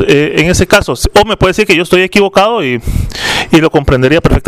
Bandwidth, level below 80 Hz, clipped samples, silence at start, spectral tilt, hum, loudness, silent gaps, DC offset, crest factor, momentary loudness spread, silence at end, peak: 16.5 kHz; -22 dBFS; 2%; 0 s; -5 dB/octave; none; -9 LUFS; none; 0.7%; 8 dB; 6 LU; 0 s; 0 dBFS